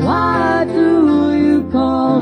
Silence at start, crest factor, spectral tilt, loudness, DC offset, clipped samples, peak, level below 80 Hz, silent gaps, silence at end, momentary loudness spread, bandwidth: 0 s; 12 dB; -8 dB/octave; -14 LUFS; under 0.1%; under 0.1%; -2 dBFS; -40 dBFS; none; 0 s; 3 LU; 9.4 kHz